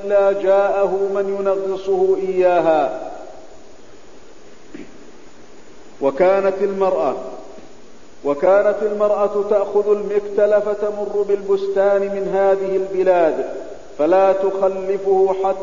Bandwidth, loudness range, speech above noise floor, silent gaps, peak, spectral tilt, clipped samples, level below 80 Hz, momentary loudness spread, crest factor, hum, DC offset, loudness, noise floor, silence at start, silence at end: 7.4 kHz; 5 LU; 27 dB; none; -2 dBFS; -6.5 dB/octave; under 0.1%; -54 dBFS; 11 LU; 16 dB; none; 2%; -18 LUFS; -44 dBFS; 0 s; 0 s